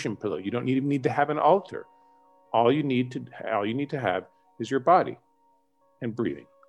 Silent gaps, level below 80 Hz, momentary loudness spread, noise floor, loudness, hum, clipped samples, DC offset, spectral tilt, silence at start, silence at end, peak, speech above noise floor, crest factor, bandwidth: none; -72 dBFS; 13 LU; -67 dBFS; -26 LUFS; none; under 0.1%; under 0.1%; -7 dB/octave; 0 s; 0.3 s; -8 dBFS; 41 dB; 20 dB; 9.8 kHz